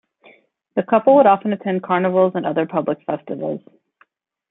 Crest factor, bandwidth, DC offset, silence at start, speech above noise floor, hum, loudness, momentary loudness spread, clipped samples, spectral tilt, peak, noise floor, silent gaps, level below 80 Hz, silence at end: 18 dB; 3.9 kHz; under 0.1%; 0.75 s; 42 dB; none; -18 LUFS; 14 LU; under 0.1%; -11.5 dB/octave; -2 dBFS; -59 dBFS; none; -68 dBFS; 0.9 s